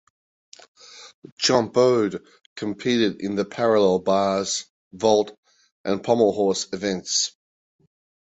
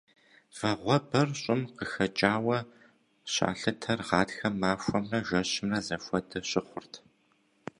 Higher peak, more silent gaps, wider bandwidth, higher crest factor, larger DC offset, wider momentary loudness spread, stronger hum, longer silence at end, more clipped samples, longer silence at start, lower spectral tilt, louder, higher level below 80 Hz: about the same, -4 dBFS vs -6 dBFS; first, 1.14-1.22 s, 1.32-1.37 s, 2.46-2.56 s, 4.70-4.91 s, 5.38-5.43 s, 5.72-5.84 s vs none; second, 8.4 kHz vs 11.5 kHz; second, 18 dB vs 24 dB; neither; second, 13 LU vs 17 LU; neither; first, 1 s vs 0.8 s; neither; first, 0.95 s vs 0.55 s; about the same, -4 dB/octave vs -4.5 dB/octave; first, -22 LUFS vs -30 LUFS; about the same, -62 dBFS vs -60 dBFS